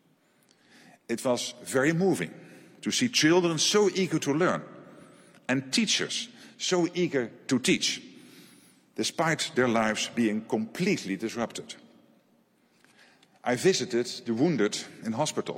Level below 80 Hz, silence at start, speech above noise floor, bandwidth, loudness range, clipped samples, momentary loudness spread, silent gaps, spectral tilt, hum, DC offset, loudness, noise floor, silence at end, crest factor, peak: -72 dBFS; 1.1 s; 39 dB; 16.5 kHz; 6 LU; under 0.1%; 12 LU; none; -3.5 dB/octave; none; under 0.1%; -27 LUFS; -66 dBFS; 0 s; 18 dB; -12 dBFS